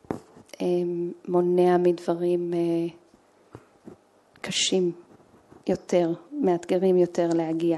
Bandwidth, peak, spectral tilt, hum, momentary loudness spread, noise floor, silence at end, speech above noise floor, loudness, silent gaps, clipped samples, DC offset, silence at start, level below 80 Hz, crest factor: 11.5 kHz; -8 dBFS; -5.5 dB/octave; none; 11 LU; -58 dBFS; 0 s; 35 dB; -25 LUFS; none; under 0.1%; under 0.1%; 0.1 s; -68 dBFS; 18 dB